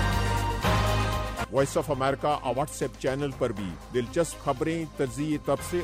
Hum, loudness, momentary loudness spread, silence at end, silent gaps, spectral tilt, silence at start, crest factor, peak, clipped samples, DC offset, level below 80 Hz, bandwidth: none; -28 LUFS; 5 LU; 0 s; none; -5.5 dB/octave; 0 s; 16 dB; -12 dBFS; under 0.1%; under 0.1%; -38 dBFS; 16 kHz